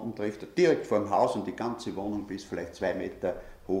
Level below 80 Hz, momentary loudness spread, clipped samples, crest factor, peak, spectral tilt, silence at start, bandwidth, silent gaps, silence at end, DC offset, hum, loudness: -56 dBFS; 11 LU; under 0.1%; 18 dB; -12 dBFS; -6 dB/octave; 0 s; 15 kHz; none; 0 s; under 0.1%; none; -30 LUFS